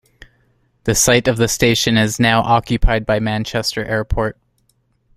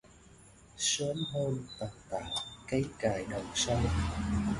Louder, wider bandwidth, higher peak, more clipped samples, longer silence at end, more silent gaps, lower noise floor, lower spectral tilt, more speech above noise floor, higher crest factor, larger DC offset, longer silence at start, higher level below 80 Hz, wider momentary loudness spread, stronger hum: first, -16 LUFS vs -34 LUFS; first, 16 kHz vs 11.5 kHz; first, 0 dBFS vs -16 dBFS; neither; first, 0.85 s vs 0 s; neither; first, -62 dBFS vs -57 dBFS; about the same, -4 dB/octave vs -4 dB/octave; first, 46 dB vs 24 dB; about the same, 16 dB vs 18 dB; neither; first, 0.85 s vs 0.05 s; first, -28 dBFS vs -44 dBFS; about the same, 8 LU vs 9 LU; neither